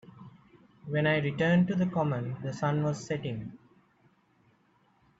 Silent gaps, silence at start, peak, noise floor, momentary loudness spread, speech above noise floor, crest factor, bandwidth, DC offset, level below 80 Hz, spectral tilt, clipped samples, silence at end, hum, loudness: none; 0.15 s; -16 dBFS; -67 dBFS; 15 LU; 39 dB; 16 dB; 8 kHz; under 0.1%; -66 dBFS; -7 dB/octave; under 0.1%; 1.65 s; none; -29 LUFS